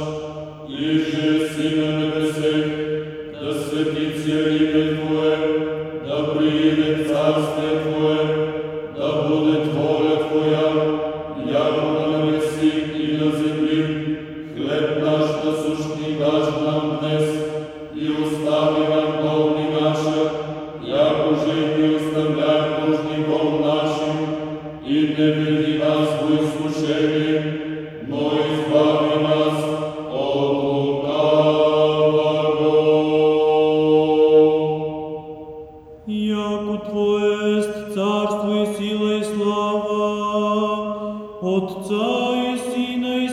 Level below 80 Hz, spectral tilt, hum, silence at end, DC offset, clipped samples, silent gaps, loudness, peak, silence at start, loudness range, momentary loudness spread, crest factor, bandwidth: -54 dBFS; -6.5 dB/octave; none; 0 s; under 0.1%; under 0.1%; none; -20 LUFS; -4 dBFS; 0 s; 5 LU; 10 LU; 14 dB; 12.5 kHz